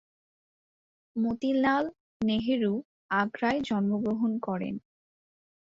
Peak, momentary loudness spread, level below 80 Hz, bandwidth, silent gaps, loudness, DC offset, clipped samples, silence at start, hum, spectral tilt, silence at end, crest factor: -12 dBFS; 9 LU; -62 dBFS; 7.4 kHz; 2.00-2.20 s, 2.85-3.09 s; -29 LUFS; under 0.1%; under 0.1%; 1.15 s; none; -7 dB/octave; 0.8 s; 18 dB